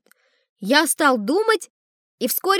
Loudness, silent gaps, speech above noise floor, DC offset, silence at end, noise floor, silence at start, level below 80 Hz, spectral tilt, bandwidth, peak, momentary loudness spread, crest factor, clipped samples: -19 LUFS; 1.70-2.18 s; 42 dB; under 0.1%; 0 s; -61 dBFS; 0.6 s; -84 dBFS; -2.5 dB/octave; over 20 kHz; -2 dBFS; 13 LU; 20 dB; under 0.1%